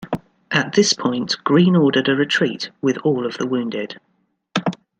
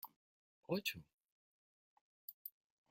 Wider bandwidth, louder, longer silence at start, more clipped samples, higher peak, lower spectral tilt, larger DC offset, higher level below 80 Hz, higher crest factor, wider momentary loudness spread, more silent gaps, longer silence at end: second, 9 kHz vs 16.5 kHz; first, -19 LUFS vs -46 LUFS; about the same, 0 s vs 0.05 s; neither; first, -2 dBFS vs -24 dBFS; about the same, -5 dB/octave vs -4 dB/octave; neither; first, -62 dBFS vs -84 dBFS; second, 18 dB vs 26 dB; second, 13 LU vs 16 LU; second, none vs 0.16-0.63 s, 1.13-2.28 s, 2.34-2.45 s; second, 0.25 s vs 0.4 s